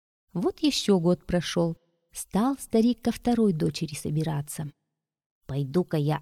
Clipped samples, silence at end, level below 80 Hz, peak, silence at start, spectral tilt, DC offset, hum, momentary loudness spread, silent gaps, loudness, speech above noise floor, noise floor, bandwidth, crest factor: under 0.1%; 0 s; -52 dBFS; -10 dBFS; 0.35 s; -6 dB/octave; under 0.1%; none; 13 LU; 5.26-5.41 s; -27 LUFS; 58 dB; -83 dBFS; 15.5 kHz; 16 dB